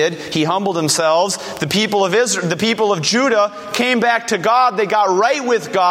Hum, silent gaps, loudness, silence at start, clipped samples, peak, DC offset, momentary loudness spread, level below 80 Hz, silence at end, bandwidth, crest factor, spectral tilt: none; none; -16 LUFS; 0 s; under 0.1%; 0 dBFS; under 0.1%; 4 LU; -60 dBFS; 0 s; 16.5 kHz; 16 dB; -3.5 dB/octave